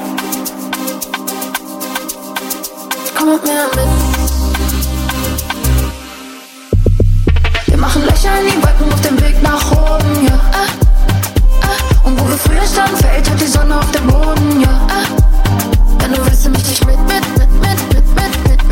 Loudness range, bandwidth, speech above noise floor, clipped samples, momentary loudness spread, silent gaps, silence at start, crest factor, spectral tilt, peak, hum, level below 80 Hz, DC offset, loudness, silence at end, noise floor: 4 LU; 17 kHz; 22 dB; under 0.1%; 8 LU; none; 0 s; 10 dB; -5 dB/octave; 0 dBFS; none; -12 dBFS; under 0.1%; -13 LUFS; 0 s; -32 dBFS